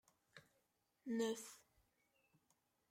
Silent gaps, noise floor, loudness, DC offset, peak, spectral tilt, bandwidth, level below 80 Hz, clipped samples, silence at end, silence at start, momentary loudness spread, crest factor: none; -84 dBFS; -45 LUFS; under 0.1%; -30 dBFS; -3.5 dB/octave; 16 kHz; under -90 dBFS; under 0.1%; 1.3 s; 0.35 s; 23 LU; 20 dB